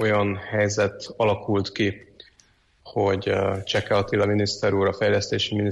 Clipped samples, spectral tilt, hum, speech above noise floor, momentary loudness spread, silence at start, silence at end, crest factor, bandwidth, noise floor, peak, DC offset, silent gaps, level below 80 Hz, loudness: under 0.1%; -5 dB/octave; none; 37 dB; 4 LU; 0 s; 0 s; 12 dB; 10 kHz; -60 dBFS; -10 dBFS; under 0.1%; none; -54 dBFS; -23 LUFS